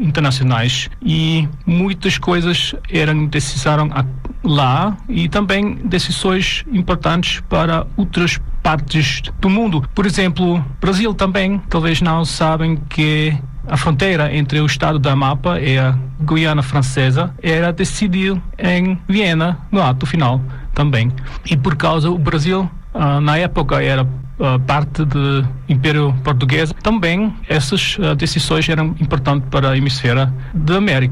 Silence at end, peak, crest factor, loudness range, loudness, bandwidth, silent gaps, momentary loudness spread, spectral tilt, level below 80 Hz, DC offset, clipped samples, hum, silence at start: 0 s; -4 dBFS; 10 dB; 1 LU; -16 LUFS; 12 kHz; none; 4 LU; -6 dB/octave; -28 dBFS; under 0.1%; under 0.1%; none; 0 s